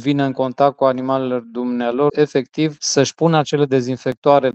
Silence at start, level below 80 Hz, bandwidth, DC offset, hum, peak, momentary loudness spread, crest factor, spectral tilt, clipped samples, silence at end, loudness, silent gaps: 0 s; -62 dBFS; 8.4 kHz; under 0.1%; none; 0 dBFS; 6 LU; 16 dB; -5.5 dB/octave; under 0.1%; 0.05 s; -18 LUFS; 4.17-4.22 s